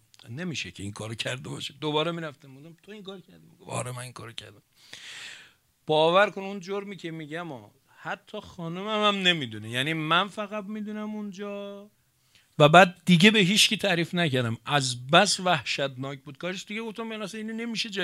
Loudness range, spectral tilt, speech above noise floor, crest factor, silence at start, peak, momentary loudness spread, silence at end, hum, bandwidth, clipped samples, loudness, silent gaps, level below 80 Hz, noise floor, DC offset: 13 LU; -4 dB/octave; 37 dB; 26 dB; 0.25 s; -2 dBFS; 22 LU; 0 s; none; 15 kHz; under 0.1%; -25 LUFS; none; -68 dBFS; -64 dBFS; under 0.1%